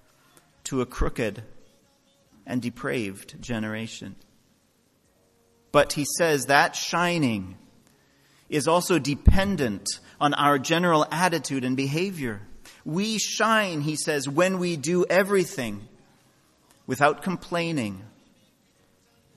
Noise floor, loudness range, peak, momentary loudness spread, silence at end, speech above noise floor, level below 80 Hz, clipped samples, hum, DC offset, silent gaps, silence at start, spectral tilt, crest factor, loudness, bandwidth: -65 dBFS; 9 LU; 0 dBFS; 13 LU; 1.3 s; 41 dB; -38 dBFS; under 0.1%; none; under 0.1%; none; 0.65 s; -4.5 dB/octave; 26 dB; -25 LUFS; 14 kHz